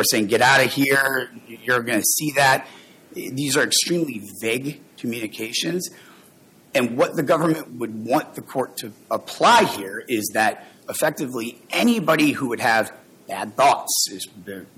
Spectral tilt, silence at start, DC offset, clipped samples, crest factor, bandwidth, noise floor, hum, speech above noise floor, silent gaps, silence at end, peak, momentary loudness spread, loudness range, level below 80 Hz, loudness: -3 dB/octave; 0 s; under 0.1%; under 0.1%; 16 dB; 17 kHz; -52 dBFS; none; 31 dB; none; 0.1 s; -6 dBFS; 14 LU; 4 LU; -64 dBFS; -20 LUFS